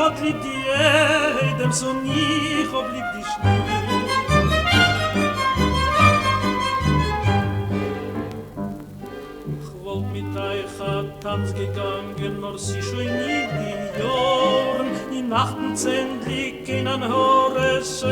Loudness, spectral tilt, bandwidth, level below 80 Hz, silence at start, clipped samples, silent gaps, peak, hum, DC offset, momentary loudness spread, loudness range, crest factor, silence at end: -21 LUFS; -5 dB/octave; 19.5 kHz; -40 dBFS; 0 s; under 0.1%; none; -2 dBFS; none; under 0.1%; 12 LU; 9 LU; 20 dB; 0 s